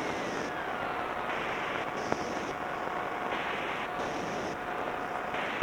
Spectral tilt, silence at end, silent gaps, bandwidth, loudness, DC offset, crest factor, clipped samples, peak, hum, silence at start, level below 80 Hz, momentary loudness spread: -4 dB/octave; 0 s; none; 19 kHz; -34 LUFS; under 0.1%; 24 dB; under 0.1%; -10 dBFS; none; 0 s; -60 dBFS; 2 LU